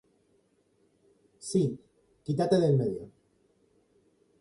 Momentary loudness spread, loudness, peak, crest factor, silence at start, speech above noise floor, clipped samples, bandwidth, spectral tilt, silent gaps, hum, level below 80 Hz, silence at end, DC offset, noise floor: 20 LU; -28 LUFS; -12 dBFS; 20 dB; 1.45 s; 43 dB; under 0.1%; 11.5 kHz; -7 dB/octave; none; none; -66 dBFS; 1.35 s; under 0.1%; -69 dBFS